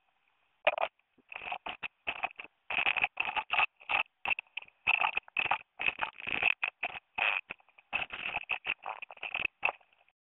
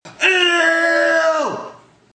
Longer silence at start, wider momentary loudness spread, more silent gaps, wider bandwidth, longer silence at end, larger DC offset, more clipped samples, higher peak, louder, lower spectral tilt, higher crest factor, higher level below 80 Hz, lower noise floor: first, 0.65 s vs 0.05 s; about the same, 11 LU vs 10 LU; neither; second, 4.2 kHz vs 10 kHz; about the same, 0.45 s vs 0.4 s; neither; neither; second, -10 dBFS vs -2 dBFS; second, -33 LUFS vs -15 LUFS; second, 2 dB/octave vs -1.5 dB/octave; first, 26 dB vs 16 dB; about the same, -68 dBFS vs -70 dBFS; first, -75 dBFS vs -40 dBFS